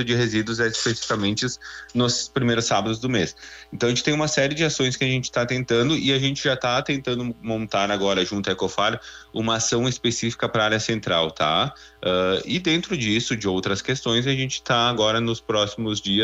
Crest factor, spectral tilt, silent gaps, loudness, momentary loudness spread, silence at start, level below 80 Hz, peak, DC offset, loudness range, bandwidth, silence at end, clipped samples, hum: 16 dB; -4 dB/octave; none; -22 LUFS; 6 LU; 0 s; -52 dBFS; -6 dBFS; under 0.1%; 2 LU; 8.4 kHz; 0 s; under 0.1%; none